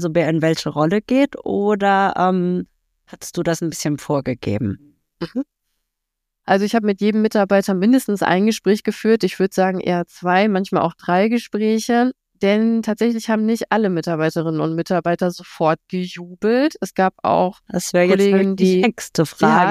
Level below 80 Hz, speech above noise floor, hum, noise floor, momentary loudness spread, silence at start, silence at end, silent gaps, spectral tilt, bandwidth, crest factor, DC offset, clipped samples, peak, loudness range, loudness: -58 dBFS; 61 dB; none; -79 dBFS; 8 LU; 0 s; 0 s; none; -6 dB/octave; 15.5 kHz; 16 dB; under 0.1%; under 0.1%; -2 dBFS; 6 LU; -18 LUFS